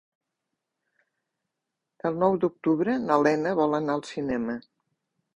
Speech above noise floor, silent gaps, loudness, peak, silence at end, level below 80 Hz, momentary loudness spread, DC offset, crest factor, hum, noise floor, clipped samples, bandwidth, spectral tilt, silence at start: 59 dB; none; -26 LUFS; -6 dBFS; 0.8 s; -64 dBFS; 9 LU; under 0.1%; 20 dB; none; -84 dBFS; under 0.1%; 10 kHz; -7 dB/octave; 2.05 s